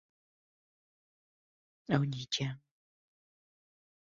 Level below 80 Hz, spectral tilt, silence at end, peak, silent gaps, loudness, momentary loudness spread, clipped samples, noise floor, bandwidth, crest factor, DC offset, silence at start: -72 dBFS; -5 dB/octave; 1.55 s; -12 dBFS; none; -34 LUFS; 18 LU; under 0.1%; under -90 dBFS; 7.4 kHz; 28 dB; under 0.1%; 1.9 s